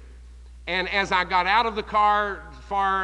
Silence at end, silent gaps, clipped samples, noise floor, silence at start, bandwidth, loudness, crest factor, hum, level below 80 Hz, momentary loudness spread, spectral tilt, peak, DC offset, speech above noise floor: 0 s; none; under 0.1%; -44 dBFS; 0 s; 10.5 kHz; -23 LUFS; 16 dB; none; -44 dBFS; 10 LU; -4 dB/octave; -8 dBFS; under 0.1%; 21 dB